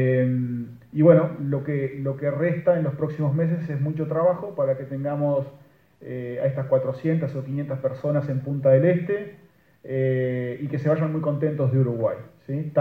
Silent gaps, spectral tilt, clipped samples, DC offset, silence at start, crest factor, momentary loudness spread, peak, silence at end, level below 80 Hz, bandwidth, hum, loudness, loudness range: none; -11 dB/octave; under 0.1%; under 0.1%; 0 s; 20 dB; 10 LU; -2 dBFS; 0 s; -64 dBFS; 4.6 kHz; none; -24 LUFS; 4 LU